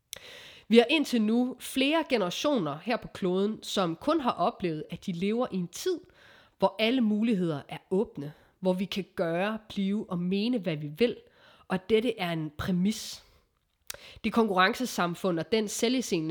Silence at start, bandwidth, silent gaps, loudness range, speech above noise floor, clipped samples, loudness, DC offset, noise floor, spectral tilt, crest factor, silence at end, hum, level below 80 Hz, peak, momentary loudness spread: 0.2 s; over 20 kHz; none; 4 LU; 43 dB; under 0.1%; -29 LUFS; under 0.1%; -71 dBFS; -5 dB/octave; 22 dB; 0 s; none; -62 dBFS; -8 dBFS; 11 LU